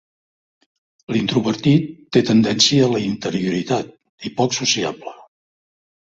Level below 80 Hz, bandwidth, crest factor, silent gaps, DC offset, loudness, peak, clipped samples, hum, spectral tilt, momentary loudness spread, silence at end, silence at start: -56 dBFS; 7.8 kHz; 18 dB; 4.09-4.18 s; under 0.1%; -18 LUFS; -2 dBFS; under 0.1%; none; -4.5 dB/octave; 15 LU; 0.9 s; 1.1 s